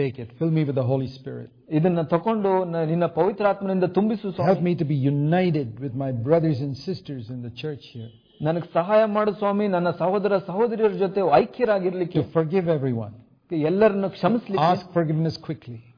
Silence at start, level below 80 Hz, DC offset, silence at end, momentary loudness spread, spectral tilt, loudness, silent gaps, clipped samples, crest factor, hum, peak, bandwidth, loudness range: 0 s; -60 dBFS; under 0.1%; 0.15 s; 13 LU; -9.5 dB/octave; -23 LUFS; none; under 0.1%; 20 dB; none; -4 dBFS; 5.2 kHz; 3 LU